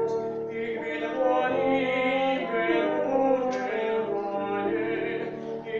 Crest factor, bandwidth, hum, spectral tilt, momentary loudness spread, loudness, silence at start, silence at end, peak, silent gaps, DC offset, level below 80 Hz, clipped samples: 14 dB; 7.2 kHz; none; -6 dB/octave; 7 LU; -27 LUFS; 0 s; 0 s; -12 dBFS; none; under 0.1%; -64 dBFS; under 0.1%